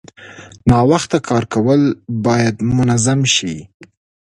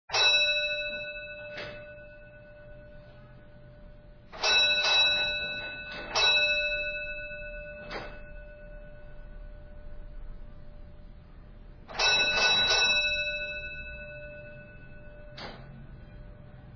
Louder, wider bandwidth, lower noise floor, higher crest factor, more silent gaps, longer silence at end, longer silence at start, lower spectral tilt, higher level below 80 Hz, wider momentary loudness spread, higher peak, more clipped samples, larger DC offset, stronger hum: first, -15 LUFS vs -24 LUFS; first, 11.5 kHz vs 5.4 kHz; second, -38 dBFS vs -50 dBFS; about the same, 16 dB vs 20 dB; first, 3.74-3.80 s vs none; first, 0.45 s vs 0 s; about the same, 0.2 s vs 0.1 s; first, -5 dB/octave vs -1 dB/octave; first, -40 dBFS vs -48 dBFS; second, 6 LU vs 26 LU; first, 0 dBFS vs -12 dBFS; neither; neither; neither